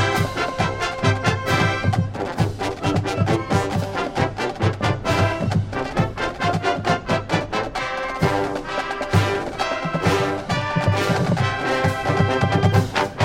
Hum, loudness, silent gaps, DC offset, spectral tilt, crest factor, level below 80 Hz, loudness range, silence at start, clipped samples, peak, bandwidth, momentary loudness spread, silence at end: none; -21 LUFS; none; under 0.1%; -6 dB/octave; 18 dB; -42 dBFS; 2 LU; 0 s; under 0.1%; -2 dBFS; 16 kHz; 5 LU; 0 s